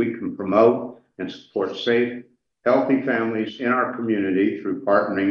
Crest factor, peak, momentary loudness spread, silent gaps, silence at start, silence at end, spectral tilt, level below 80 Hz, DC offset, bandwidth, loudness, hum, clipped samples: 18 dB; -4 dBFS; 12 LU; none; 0 s; 0 s; -7.5 dB/octave; -72 dBFS; under 0.1%; 7 kHz; -22 LUFS; none; under 0.1%